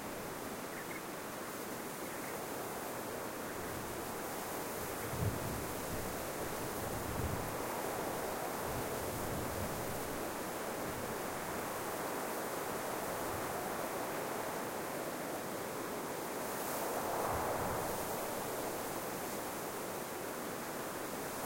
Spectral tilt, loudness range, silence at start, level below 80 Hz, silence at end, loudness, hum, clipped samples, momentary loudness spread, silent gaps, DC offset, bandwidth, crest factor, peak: -4 dB/octave; 3 LU; 0 s; -58 dBFS; 0 s; -40 LUFS; none; under 0.1%; 4 LU; none; under 0.1%; 16.5 kHz; 16 dB; -24 dBFS